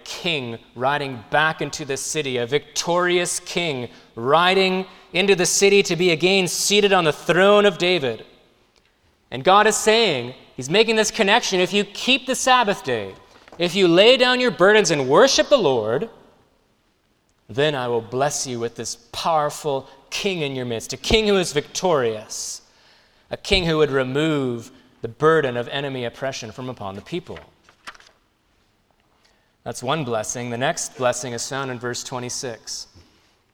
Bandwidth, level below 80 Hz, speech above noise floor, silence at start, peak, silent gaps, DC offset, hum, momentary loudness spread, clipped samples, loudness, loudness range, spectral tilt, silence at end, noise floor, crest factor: 18.5 kHz; -48 dBFS; 44 dB; 0.05 s; 0 dBFS; none; under 0.1%; none; 16 LU; under 0.1%; -19 LUFS; 10 LU; -3 dB/octave; 0.7 s; -64 dBFS; 20 dB